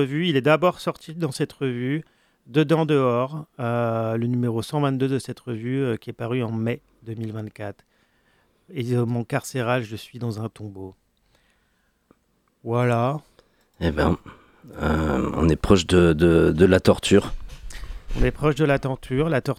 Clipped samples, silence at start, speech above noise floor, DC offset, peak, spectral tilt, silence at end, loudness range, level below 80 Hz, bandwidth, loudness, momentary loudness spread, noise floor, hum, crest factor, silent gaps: under 0.1%; 0 s; 45 dB; under 0.1%; -2 dBFS; -6.5 dB/octave; 0.05 s; 10 LU; -38 dBFS; 15.5 kHz; -23 LUFS; 18 LU; -67 dBFS; none; 20 dB; none